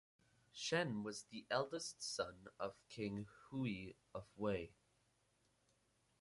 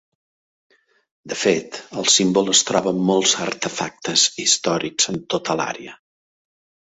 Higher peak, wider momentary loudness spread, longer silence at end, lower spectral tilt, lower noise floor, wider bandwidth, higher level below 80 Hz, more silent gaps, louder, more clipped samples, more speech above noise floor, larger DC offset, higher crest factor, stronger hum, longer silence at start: second, -24 dBFS vs 0 dBFS; about the same, 12 LU vs 11 LU; first, 1.5 s vs 0.9 s; first, -4 dB/octave vs -2 dB/octave; second, -80 dBFS vs under -90 dBFS; first, 11.5 kHz vs 8.4 kHz; second, -74 dBFS vs -62 dBFS; neither; second, -45 LUFS vs -18 LUFS; neither; second, 35 dB vs over 70 dB; neither; about the same, 22 dB vs 20 dB; neither; second, 0.55 s vs 1.25 s